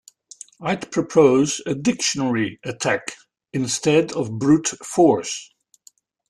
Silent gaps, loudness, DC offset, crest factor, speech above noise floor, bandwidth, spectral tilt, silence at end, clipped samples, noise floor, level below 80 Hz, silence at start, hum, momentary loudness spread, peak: none; -20 LUFS; under 0.1%; 18 dB; 36 dB; 12.5 kHz; -4.5 dB/octave; 0.85 s; under 0.1%; -55 dBFS; -60 dBFS; 0.6 s; none; 14 LU; -2 dBFS